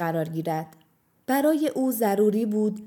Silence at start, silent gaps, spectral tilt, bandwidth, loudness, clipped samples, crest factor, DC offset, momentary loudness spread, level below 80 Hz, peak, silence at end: 0 s; none; -6.5 dB/octave; 19 kHz; -25 LUFS; under 0.1%; 14 dB; under 0.1%; 10 LU; -80 dBFS; -10 dBFS; 0 s